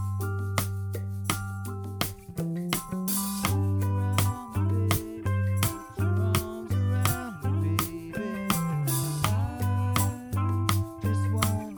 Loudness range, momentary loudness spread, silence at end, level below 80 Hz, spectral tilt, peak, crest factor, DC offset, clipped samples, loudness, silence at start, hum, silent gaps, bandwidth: 2 LU; 6 LU; 0 s; -48 dBFS; -5 dB/octave; -8 dBFS; 20 dB; under 0.1%; under 0.1%; -28 LUFS; 0 s; none; none; over 20 kHz